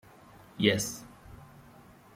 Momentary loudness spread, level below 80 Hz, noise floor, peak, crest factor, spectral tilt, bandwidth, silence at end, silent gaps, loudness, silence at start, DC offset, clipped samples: 25 LU; -62 dBFS; -55 dBFS; -8 dBFS; 26 dB; -4 dB/octave; 16.5 kHz; 0.7 s; none; -29 LUFS; 0.55 s; under 0.1%; under 0.1%